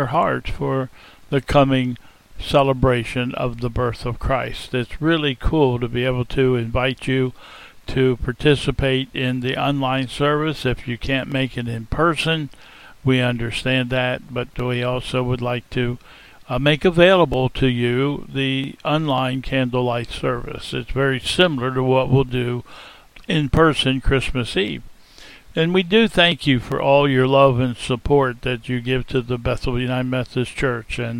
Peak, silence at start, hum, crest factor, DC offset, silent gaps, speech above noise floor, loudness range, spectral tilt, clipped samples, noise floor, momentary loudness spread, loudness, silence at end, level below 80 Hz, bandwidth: 0 dBFS; 0 s; none; 20 dB; under 0.1%; none; 24 dB; 4 LU; -6.5 dB/octave; under 0.1%; -44 dBFS; 10 LU; -20 LUFS; 0 s; -34 dBFS; 13.5 kHz